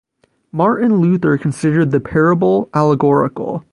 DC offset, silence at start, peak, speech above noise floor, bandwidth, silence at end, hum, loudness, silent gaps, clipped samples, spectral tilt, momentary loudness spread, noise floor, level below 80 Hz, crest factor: under 0.1%; 0.55 s; 0 dBFS; 32 dB; 11 kHz; 0.1 s; none; -15 LUFS; none; under 0.1%; -8.5 dB/octave; 4 LU; -46 dBFS; -48 dBFS; 14 dB